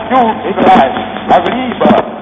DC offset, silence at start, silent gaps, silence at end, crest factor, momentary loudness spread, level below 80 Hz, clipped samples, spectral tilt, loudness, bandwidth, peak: under 0.1%; 0 s; none; 0 s; 10 dB; 6 LU; -42 dBFS; 0.8%; -7 dB/octave; -10 LUFS; 7.6 kHz; 0 dBFS